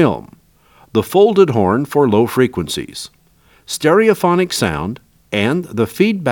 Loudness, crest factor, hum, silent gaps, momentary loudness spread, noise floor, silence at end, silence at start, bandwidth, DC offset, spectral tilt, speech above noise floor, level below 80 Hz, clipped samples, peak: -15 LUFS; 16 dB; none; none; 14 LU; -52 dBFS; 0 s; 0 s; over 20 kHz; under 0.1%; -5.5 dB/octave; 38 dB; -50 dBFS; under 0.1%; 0 dBFS